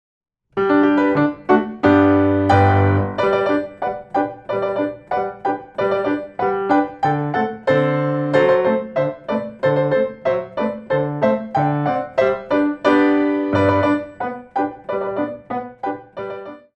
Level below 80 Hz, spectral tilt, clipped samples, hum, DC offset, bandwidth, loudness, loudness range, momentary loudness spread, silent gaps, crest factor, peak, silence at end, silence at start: -54 dBFS; -8.5 dB/octave; under 0.1%; none; under 0.1%; 7.8 kHz; -19 LUFS; 5 LU; 11 LU; none; 16 dB; -2 dBFS; 0.15 s; 0.55 s